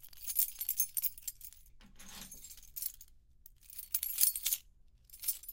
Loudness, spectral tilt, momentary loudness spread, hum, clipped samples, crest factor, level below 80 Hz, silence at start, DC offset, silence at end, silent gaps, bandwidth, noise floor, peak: -34 LUFS; 2 dB/octave; 22 LU; none; under 0.1%; 36 dB; -62 dBFS; 0 s; under 0.1%; 0 s; none; 17 kHz; -62 dBFS; -4 dBFS